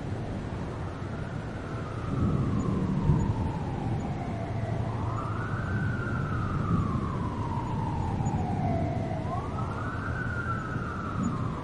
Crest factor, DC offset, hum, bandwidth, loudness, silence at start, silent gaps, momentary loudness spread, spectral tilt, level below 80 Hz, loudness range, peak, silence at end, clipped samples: 18 dB; 0.2%; none; 10.5 kHz; -31 LUFS; 0 s; none; 7 LU; -8 dB/octave; -42 dBFS; 2 LU; -12 dBFS; 0 s; under 0.1%